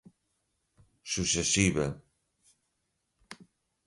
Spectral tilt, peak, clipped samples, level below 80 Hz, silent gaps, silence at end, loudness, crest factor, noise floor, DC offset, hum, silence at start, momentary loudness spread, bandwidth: -3 dB/octave; -12 dBFS; under 0.1%; -52 dBFS; none; 0.45 s; -28 LUFS; 24 dB; -80 dBFS; under 0.1%; none; 1.05 s; 25 LU; 11.5 kHz